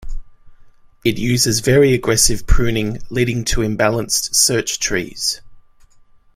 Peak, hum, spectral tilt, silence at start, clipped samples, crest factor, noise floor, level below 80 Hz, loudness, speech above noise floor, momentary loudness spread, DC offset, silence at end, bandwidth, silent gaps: 0 dBFS; none; -3.5 dB/octave; 0 s; under 0.1%; 16 dB; -48 dBFS; -26 dBFS; -16 LUFS; 32 dB; 8 LU; under 0.1%; 0.75 s; 16 kHz; none